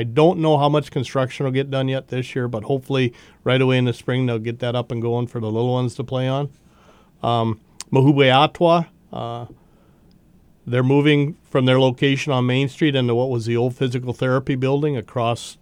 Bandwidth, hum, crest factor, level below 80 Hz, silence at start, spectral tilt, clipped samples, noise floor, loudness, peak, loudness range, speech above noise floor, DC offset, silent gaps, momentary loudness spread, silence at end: 10.5 kHz; none; 20 dB; -56 dBFS; 0 s; -7 dB/octave; under 0.1%; -53 dBFS; -20 LUFS; 0 dBFS; 4 LU; 33 dB; under 0.1%; none; 10 LU; 0.1 s